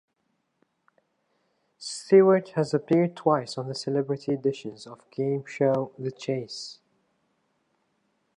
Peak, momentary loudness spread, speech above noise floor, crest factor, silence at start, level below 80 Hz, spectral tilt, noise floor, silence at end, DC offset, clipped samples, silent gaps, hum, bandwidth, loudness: -6 dBFS; 18 LU; 50 dB; 20 dB; 1.8 s; -78 dBFS; -6.5 dB/octave; -75 dBFS; 1.65 s; under 0.1%; under 0.1%; none; none; 10.5 kHz; -25 LUFS